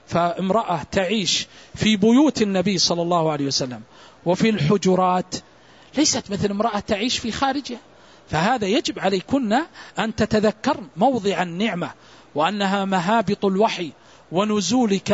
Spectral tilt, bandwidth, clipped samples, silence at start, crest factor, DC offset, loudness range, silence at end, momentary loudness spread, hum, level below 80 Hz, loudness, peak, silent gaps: -4.5 dB/octave; 8 kHz; under 0.1%; 0.1 s; 16 dB; under 0.1%; 3 LU; 0 s; 11 LU; none; -52 dBFS; -21 LUFS; -4 dBFS; none